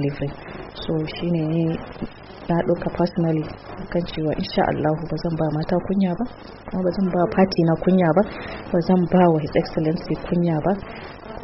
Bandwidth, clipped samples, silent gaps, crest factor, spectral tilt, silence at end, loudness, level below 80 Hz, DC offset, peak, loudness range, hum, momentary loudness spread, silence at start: 6 kHz; under 0.1%; none; 16 dB; -7 dB/octave; 0 s; -22 LUFS; -44 dBFS; under 0.1%; -6 dBFS; 5 LU; none; 15 LU; 0 s